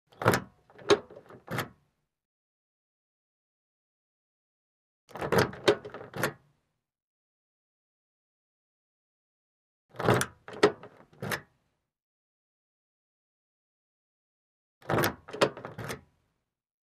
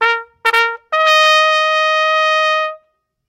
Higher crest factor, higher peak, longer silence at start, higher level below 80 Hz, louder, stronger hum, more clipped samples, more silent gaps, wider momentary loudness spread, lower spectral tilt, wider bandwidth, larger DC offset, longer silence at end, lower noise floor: first, 28 dB vs 14 dB; second, -6 dBFS vs 0 dBFS; first, 0.2 s vs 0 s; about the same, -62 dBFS vs -64 dBFS; second, -30 LUFS vs -12 LUFS; neither; second, under 0.1% vs 0.1%; first, 2.25-5.08 s, 7.02-9.89 s, 12.02-14.81 s vs none; first, 15 LU vs 7 LU; first, -4.5 dB/octave vs 3 dB/octave; about the same, 15.5 kHz vs 16.5 kHz; neither; first, 0.9 s vs 0.55 s; first, -81 dBFS vs -61 dBFS